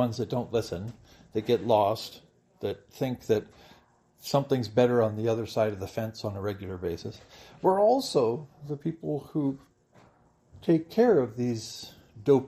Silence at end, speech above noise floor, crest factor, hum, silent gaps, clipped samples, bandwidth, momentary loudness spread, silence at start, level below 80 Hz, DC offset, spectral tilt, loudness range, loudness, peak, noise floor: 0 s; 34 dB; 18 dB; none; none; under 0.1%; 15 kHz; 15 LU; 0 s; -64 dBFS; under 0.1%; -6.5 dB/octave; 2 LU; -28 LUFS; -10 dBFS; -61 dBFS